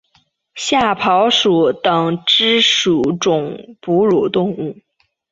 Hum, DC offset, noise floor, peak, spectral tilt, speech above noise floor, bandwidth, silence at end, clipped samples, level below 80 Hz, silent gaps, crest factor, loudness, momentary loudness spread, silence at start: none; under 0.1%; -59 dBFS; -2 dBFS; -4 dB/octave; 44 dB; 8 kHz; 0.6 s; under 0.1%; -54 dBFS; none; 14 dB; -14 LUFS; 12 LU; 0.55 s